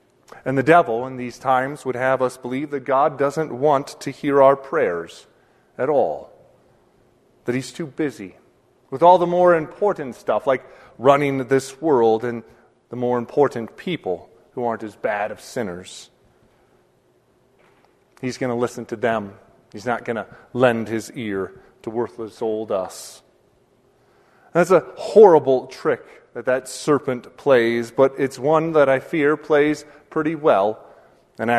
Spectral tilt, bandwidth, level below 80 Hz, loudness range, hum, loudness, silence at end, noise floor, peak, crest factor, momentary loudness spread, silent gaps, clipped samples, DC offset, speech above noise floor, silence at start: -6 dB/octave; 13.5 kHz; -62 dBFS; 10 LU; none; -20 LUFS; 0 s; -60 dBFS; 0 dBFS; 20 dB; 15 LU; none; under 0.1%; under 0.1%; 40 dB; 0.35 s